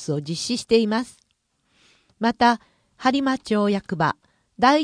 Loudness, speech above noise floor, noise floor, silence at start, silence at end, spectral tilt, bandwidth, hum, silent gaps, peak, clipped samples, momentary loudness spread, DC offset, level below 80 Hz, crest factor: -22 LUFS; 49 dB; -70 dBFS; 0 s; 0 s; -5 dB/octave; 10.5 kHz; none; none; -4 dBFS; under 0.1%; 8 LU; under 0.1%; -58 dBFS; 18 dB